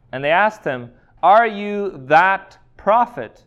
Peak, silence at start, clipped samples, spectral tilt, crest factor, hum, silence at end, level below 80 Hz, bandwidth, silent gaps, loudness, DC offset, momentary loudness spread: 0 dBFS; 0.15 s; under 0.1%; -6 dB/octave; 16 dB; none; 0.2 s; -56 dBFS; 8 kHz; none; -17 LUFS; under 0.1%; 12 LU